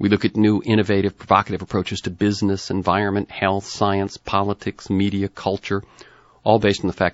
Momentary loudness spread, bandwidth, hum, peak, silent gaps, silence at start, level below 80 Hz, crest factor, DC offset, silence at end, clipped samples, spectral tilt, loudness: 7 LU; 8 kHz; none; 0 dBFS; none; 0 s; -50 dBFS; 20 dB; under 0.1%; 0 s; under 0.1%; -5 dB/octave; -21 LUFS